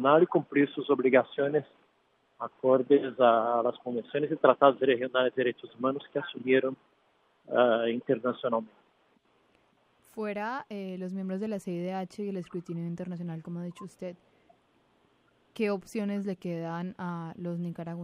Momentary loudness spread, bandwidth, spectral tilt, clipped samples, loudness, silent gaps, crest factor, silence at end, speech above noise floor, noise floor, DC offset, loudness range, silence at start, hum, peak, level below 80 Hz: 15 LU; 11.5 kHz; -7.5 dB/octave; under 0.1%; -29 LUFS; none; 24 dB; 0 s; 41 dB; -70 dBFS; under 0.1%; 12 LU; 0 s; none; -6 dBFS; -80 dBFS